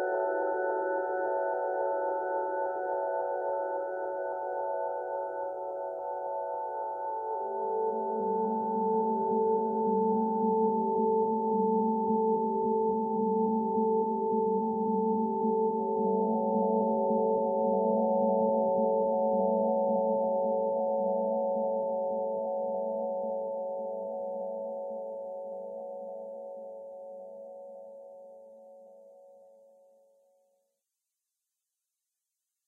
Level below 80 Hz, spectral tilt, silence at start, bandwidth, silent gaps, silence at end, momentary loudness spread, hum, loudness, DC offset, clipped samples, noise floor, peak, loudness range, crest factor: -80 dBFS; -12 dB/octave; 0 s; 1.9 kHz; none; 3.4 s; 12 LU; none; -30 LUFS; under 0.1%; under 0.1%; -87 dBFS; -16 dBFS; 13 LU; 14 dB